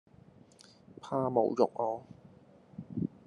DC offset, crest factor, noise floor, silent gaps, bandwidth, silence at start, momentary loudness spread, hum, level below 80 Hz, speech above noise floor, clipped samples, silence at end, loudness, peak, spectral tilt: under 0.1%; 24 dB; -59 dBFS; none; 11 kHz; 1.05 s; 22 LU; none; -74 dBFS; 28 dB; under 0.1%; 0.2 s; -33 LUFS; -10 dBFS; -8.5 dB/octave